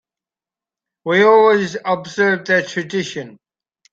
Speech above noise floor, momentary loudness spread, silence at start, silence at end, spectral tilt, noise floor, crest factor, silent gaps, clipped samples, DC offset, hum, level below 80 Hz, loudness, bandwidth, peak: 74 dB; 14 LU; 1.05 s; 0.6 s; -5 dB/octave; -90 dBFS; 16 dB; none; under 0.1%; under 0.1%; none; -64 dBFS; -16 LUFS; 7.8 kHz; -2 dBFS